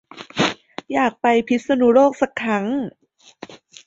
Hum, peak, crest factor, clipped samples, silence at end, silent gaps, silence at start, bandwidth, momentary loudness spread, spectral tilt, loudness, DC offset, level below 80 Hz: none; -4 dBFS; 16 dB; under 0.1%; 0.3 s; none; 0.15 s; 7.8 kHz; 18 LU; -5 dB/octave; -19 LUFS; under 0.1%; -60 dBFS